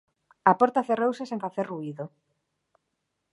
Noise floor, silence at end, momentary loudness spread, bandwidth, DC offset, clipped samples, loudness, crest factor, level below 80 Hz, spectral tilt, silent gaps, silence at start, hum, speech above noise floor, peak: -80 dBFS; 1.25 s; 16 LU; 11 kHz; under 0.1%; under 0.1%; -26 LUFS; 24 dB; -76 dBFS; -7 dB/octave; none; 0.45 s; none; 54 dB; -4 dBFS